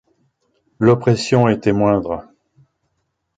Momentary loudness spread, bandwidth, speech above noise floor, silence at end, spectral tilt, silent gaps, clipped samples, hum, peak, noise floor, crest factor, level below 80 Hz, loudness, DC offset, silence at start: 8 LU; 9.2 kHz; 56 dB; 1.15 s; -7 dB/octave; none; under 0.1%; none; -2 dBFS; -71 dBFS; 18 dB; -48 dBFS; -16 LUFS; under 0.1%; 0.8 s